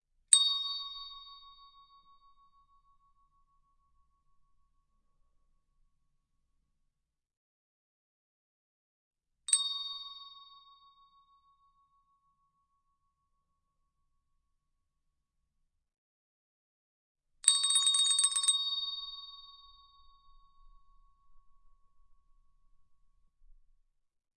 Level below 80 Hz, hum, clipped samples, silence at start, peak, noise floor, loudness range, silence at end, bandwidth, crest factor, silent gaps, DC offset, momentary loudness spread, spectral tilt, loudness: -72 dBFS; none; under 0.1%; 0.3 s; -6 dBFS; -83 dBFS; 16 LU; 2.95 s; 11.5 kHz; 32 dB; 7.37-9.11 s, 15.98-17.15 s; under 0.1%; 23 LU; 6.5 dB/octave; -27 LUFS